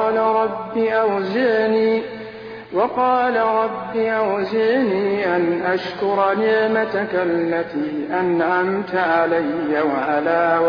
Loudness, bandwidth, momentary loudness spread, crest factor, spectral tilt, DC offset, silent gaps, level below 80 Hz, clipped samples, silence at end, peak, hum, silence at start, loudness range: -19 LUFS; 5.4 kHz; 5 LU; 14 dB; -7.5 dB/octave; under 0.1%; none; -60 dBFS; under 0.1%; 0 s; -6 dBFS; none; 0 s; 1 LU